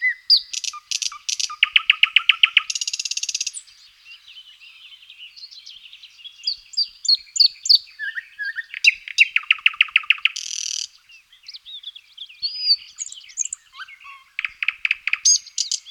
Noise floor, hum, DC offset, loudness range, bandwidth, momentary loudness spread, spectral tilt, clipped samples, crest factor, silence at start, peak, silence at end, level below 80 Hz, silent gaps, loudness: -51 dBFS; none; under 0.1%; 11 LU; 17.5 kHz; 23 LU; 8 dB/octave; under 0.1%; 22 dB; 0 s; 0 dBFS; 0 s; -70 dBFS; none; -18 LUFS